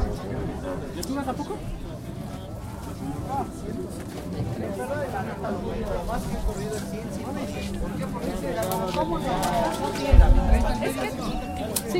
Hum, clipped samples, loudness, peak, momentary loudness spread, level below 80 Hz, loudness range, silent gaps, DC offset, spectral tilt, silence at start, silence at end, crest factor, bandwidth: none; under 0.1%; -28 LUFS; -2 dBFS; 11 LU; -28 dBFS; 8 LU; none; under 0.1%; -6 dB/octave; 0 s; 0 s; 24 dB; 16 kHz